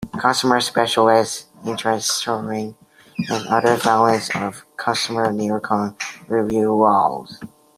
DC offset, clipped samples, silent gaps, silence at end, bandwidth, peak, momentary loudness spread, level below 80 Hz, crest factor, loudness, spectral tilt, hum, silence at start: under 0.1%; under 0.1%; none; 0.3 s; 15.5 kHz; -2 dBFS; 13 LU; -58 dBFS; 18 dB; -19 LUFS; -4 dB/octave; none; 0 s